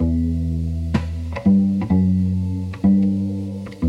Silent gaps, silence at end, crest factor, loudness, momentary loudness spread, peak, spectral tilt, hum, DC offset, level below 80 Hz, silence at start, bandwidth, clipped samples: none; 0 s; 14 dB; -20 LUFS; 9 LU; -6 dBFS; -9.5 dB/octave; none; under 0.1%; -36 dBFS; 0 s; 6.2 kHz; under 0.1%